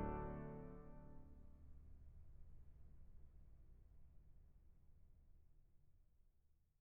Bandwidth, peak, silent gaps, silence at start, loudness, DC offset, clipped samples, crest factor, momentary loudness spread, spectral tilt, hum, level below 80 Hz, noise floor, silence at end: 3.1 kHz; -36 dBFS; none; 0 s; -58 LUFS; under 0.1%; under 0.1%; 22 dB; 17 LU; -6 dB/octave; none; -62 dBFS; -77 dBFS; 0.15 s